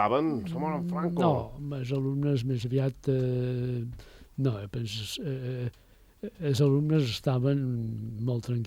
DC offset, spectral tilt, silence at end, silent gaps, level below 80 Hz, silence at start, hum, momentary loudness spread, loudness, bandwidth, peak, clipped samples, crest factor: under 0.1%; -7.5 dB/octave; 0 s; none; -54 dBFS; 0 s; none; 10 LU; -30 LUFS; 15 kHz; -12 dBFS; under 0.1%; 16 dB